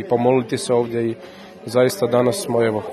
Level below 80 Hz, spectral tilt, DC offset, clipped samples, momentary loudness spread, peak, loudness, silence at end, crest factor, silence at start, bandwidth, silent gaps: -62 dBFS; -5.5 dB/octave; under 0.1%; under 0.1%; 13 LU; -2 dBFS; -19 LUFS; 0 s; 16 dB; 0 s; 13 kHz; none